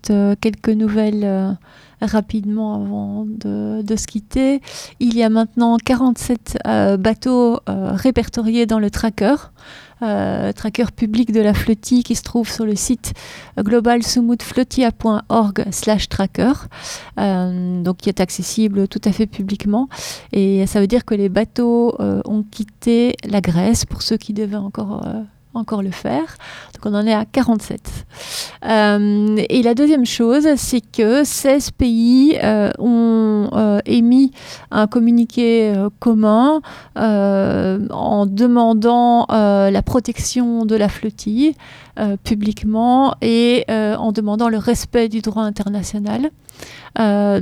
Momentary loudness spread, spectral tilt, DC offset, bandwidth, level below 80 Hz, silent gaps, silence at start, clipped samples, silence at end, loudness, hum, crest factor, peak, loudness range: 10 LU; -5.5 dB/octave; under 0.1%; 15.5 kHz; -38 dBFS; none; 0.05 s; under 0.1%; 0 s; -17 LUFS; none; 14 dB; -2 dBFS; 5 LU